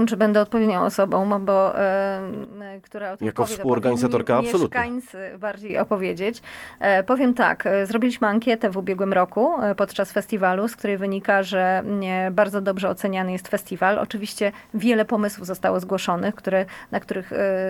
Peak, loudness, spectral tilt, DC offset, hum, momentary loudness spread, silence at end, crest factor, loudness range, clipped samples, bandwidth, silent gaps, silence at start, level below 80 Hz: -4 dBFS; -22 LUFS; -6 dB/octave; under 0.1%; none; 9 LU; 0 s; 18 dB; 3 LU; under 0.1%; 18 kHz; none; 0 s; -58 dBFS